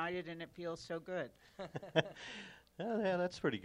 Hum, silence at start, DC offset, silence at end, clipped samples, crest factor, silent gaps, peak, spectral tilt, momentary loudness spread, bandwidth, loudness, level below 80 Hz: none; 0 s; under 0.1%; 0 s; under 0.1%; 26 dB; none; -14 dBFS; -5.5 dB/octave; 13 LU; 15 kHz; -41 LUFS; -72 dBFS